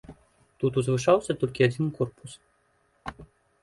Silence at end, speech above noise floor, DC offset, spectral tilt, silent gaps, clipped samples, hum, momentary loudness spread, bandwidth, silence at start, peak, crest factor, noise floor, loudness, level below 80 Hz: 0.4 s; 43 dB; under 0.1%; -6.5 dB/octave; none; under 0.1%; none; 19 LU; 11.5 kHz; 0.1 s; -8 dBFS; 20 dB; -68 dBFS; -26 LUFS; -58 dBFS